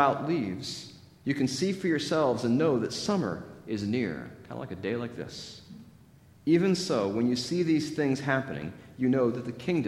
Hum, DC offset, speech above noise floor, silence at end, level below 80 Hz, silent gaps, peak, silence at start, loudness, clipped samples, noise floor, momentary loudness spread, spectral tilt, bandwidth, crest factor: none; under 0.1%; 28 dB; 0 s; -64 dBFS; none; -8 dBFS; 0 s; -29 LUFS; under 0.1%; -56 dBFS; 15 LU; -5.5 dB/octave; 14 kHz; 20 dB